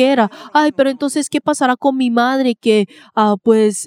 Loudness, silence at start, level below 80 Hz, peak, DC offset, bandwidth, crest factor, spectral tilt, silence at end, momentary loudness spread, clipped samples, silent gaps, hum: -15 LUFS; 0 s; -66 dBFS; 0 dBFS; under 0.1%; 15.5 kHz; 14 dB; -4.5 dB/octave; 0 s; 5 LU; under 0.1%; none; none